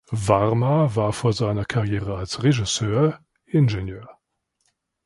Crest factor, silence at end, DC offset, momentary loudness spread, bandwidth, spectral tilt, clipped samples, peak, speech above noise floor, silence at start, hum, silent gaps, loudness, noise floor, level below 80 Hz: 20 dB; 0.95 s; under 0.1%; 9 LU; 11.5 kHz; -6 dB/octave; under 0.1%; -2 dBFS; 52 dB; 0.1 s; none; none; -22 LUFS; -73 dBFS; -44 dBFS